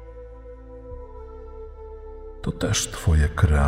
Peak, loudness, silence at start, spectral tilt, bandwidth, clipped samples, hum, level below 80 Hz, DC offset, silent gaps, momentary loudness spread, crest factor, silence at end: -6 dBFS; -23 LUFS; 0 s; -5 dB/octave; 15.5 kHz; under 0.1%; none; -28 dBFS; under 0.1%; none; 21 LU; 20 dB; 0 s